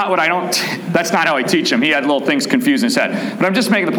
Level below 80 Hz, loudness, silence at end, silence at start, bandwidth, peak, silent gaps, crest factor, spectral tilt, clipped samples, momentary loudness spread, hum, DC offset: -64 dBFS; -15 LUFS; 0 s; 0 s; 20 kHz; -2 dBFS; none; 14 dB; -4 dB/octave; under 0.1%; 4 LU; none; under 0.1%